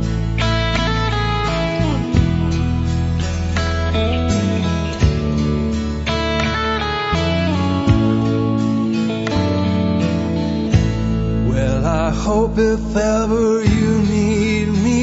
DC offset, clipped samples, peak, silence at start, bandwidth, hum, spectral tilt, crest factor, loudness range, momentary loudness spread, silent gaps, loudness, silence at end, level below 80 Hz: under 0.1%; under 0.1%; 0 dBFS; 0 s; 8 kHz; none; -6.5 dB/octave; 16 dB; 2 LU; 4 LU; none; -18 LUFS; 0 s; -26 dBFS